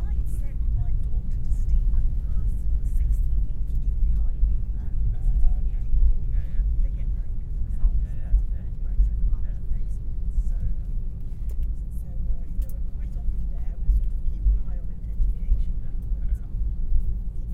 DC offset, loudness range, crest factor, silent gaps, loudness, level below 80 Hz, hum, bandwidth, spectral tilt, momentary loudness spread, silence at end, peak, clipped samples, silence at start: under 0.1%; 5 LU; 16 dB; none; -29 LUFS; -24 dBFS; none; 1 kHz; -9 dB/octave; 7 LU; 0 s; -6 dBFS; under 0.1%; 0 s